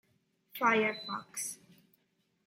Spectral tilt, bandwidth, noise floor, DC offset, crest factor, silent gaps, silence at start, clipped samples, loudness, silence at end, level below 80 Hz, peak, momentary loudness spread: -2.5 dB/octave; 16 kHz; -77 dBFS; under 0.1%; 22 dB; none; 0.55 s; under 0.1%; -32 LUFS; 0.9 s; -82 dBFS; -14 dBFS; 18 LU